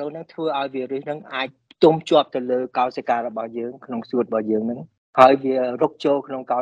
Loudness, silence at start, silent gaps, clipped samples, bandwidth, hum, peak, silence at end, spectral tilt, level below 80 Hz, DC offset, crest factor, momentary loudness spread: -21 LUFS; 0 s; 4.98-5.13 s; under 0.1%; 9.4 kHz; none; 0 dBFS; 0 s; -6.5 dB/octave; -66 dBFS; under 0.1%; 20 dB; 15 LU